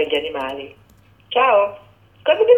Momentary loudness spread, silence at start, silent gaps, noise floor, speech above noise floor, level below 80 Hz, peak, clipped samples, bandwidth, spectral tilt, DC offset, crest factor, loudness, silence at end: 15 LU; 0 s; none; -38 dBFS; 22 dB; -58 dBFS; -2 dBFS; under 0.1%; 3.9 kHz; -4.5 dB/octave; under 0.1%; 16 dB; -19 LUFS; 0 s